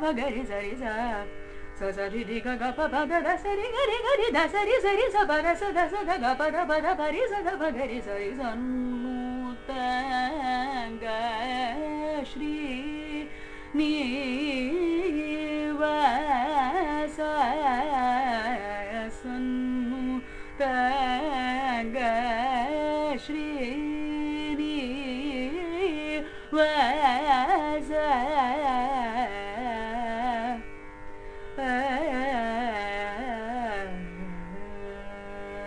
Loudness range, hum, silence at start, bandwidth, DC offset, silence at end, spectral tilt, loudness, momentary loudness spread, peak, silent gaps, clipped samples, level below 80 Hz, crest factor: 6 LU; none; 0 s; 10.5 kHz; under 0.1%; 0 s; -4.5 dB/octave; -28 LUFS; 11 LU; -10 dBFS; none; under 0.1%; -46 dBFS; 18 dB